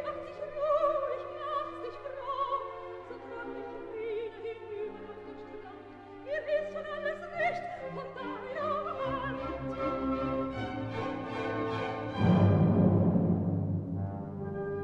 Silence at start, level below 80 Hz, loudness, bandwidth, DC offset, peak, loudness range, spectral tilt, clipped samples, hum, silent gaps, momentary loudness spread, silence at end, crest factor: 0 s; -56 dBFS; -33 LUFS; 7.2 kHz; under 0.1%; -14 dBFS; 10 LU; -9 dB/octave; under 0.1%; none; none; 17 LU; 0 s; 18 dB